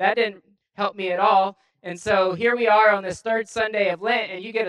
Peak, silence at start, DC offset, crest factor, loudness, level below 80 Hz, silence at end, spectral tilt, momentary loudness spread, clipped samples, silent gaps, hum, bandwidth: -4 dBFS; 0 s; under 0.1%; 18 dB; -21 LUFS; -62 dBFS; 0 s; -4 dB/octave; 11 LU; under 0.1%; none; none; 11 kHz